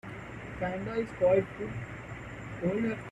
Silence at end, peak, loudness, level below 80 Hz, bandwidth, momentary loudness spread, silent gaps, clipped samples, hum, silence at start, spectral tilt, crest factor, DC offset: 0 s; -14 dBFS; -33 LUFS; -54 dBFS; 10 kHz; 16 LU; none; under 0.1%; none; 0.05 s; -8 dB/octave; 18 dB; under 0.1%